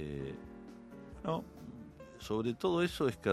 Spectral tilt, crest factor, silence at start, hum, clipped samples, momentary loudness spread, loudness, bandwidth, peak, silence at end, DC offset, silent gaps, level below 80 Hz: -6 dB/octave; 20 dB; 0 s; none; under 0.1%; 19 LU; -36 LUFS; 14.5 kHz; -16 dBFS; 0 s; under 0.1%; none; -58 dBFS